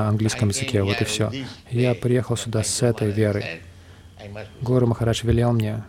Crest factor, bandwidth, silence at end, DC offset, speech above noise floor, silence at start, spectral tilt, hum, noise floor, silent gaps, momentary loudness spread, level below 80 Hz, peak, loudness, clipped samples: 16 dB; 15 kHz; 0 s; under 0.1%; 23 dB; 0 s; -5.5 dB/octave; none; -45 dBFS; none; 13 LU; -44 dBFS; -6 dBFS; -22 LUFS; under 0.1%